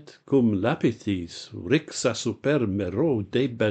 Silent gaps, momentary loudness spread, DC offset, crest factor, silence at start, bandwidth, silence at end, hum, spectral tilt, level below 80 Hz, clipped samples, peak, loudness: none; 7 LU; under 0.1%; 16 dB; 0.05 s; 9.2 kHz; 0 s; none; -6 dB/octave; -58 dBFS; under 0.1%; -8 dBFS; -25 LUFS